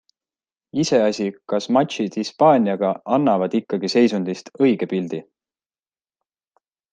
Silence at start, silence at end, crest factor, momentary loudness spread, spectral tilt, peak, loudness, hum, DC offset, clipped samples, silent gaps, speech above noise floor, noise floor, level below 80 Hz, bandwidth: 0.75 s; 1.7 s; 18 dB; 9 LU; -6 dB/octave; -2 dBFS; -20 LUFS; none; under 0.1%; under 0.1%; none; over 71 dB; under -90 dBFS; -68 dBFS; 9.2 kHz